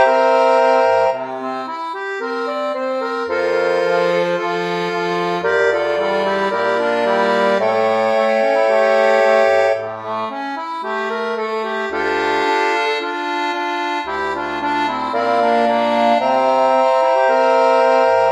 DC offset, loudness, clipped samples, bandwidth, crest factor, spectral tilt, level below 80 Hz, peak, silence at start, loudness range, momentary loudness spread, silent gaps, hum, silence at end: under 0.1%; -17 LUFS; under 0.1%; 12.5 kHz; 14 dB; -4.5 dB/octave; -58 dBFS; -2 dBFS; 0 s; 5 LU; 10 LU; none; none; 0 s